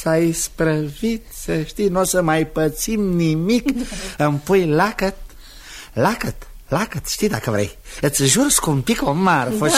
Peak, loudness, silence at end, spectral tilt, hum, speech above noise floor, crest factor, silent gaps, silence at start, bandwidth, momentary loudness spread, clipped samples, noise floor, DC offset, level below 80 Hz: -2 dBFS; -19 LUFS; 0 s; -4.5 dB/octave; none; 20 dB; 18 dB; none; 0 s; 16 kHz; 10 LU; under 0.1%; -39 dBFS; 0.2%; -38 dBFS